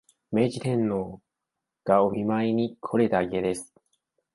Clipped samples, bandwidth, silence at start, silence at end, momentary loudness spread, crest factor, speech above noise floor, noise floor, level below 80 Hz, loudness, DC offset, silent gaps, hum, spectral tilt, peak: under 0.1%; 11.5 kHz; 0.3 s; 0.7 s; 9 LU; 20 dB; 61 dB; -85 dBFS; -60 dBFS; -26 LUFS; under 0.1%; none; none; -7 dB/octave; -6 dBFS